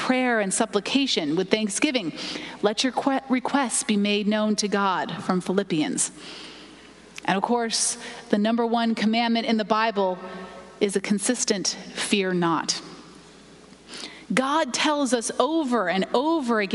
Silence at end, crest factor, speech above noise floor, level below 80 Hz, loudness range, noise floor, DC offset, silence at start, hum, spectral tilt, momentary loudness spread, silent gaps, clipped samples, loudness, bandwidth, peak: 0 s; 22 dB; 25 dB; -64 dBFS; 2 LU; -48 dBFS; under 0.1%; 0 s; none; -3.5 dB/octave; 11 LU; none; under 0.1%; -24 LUFS; 11.5 kHz; -4 dBFS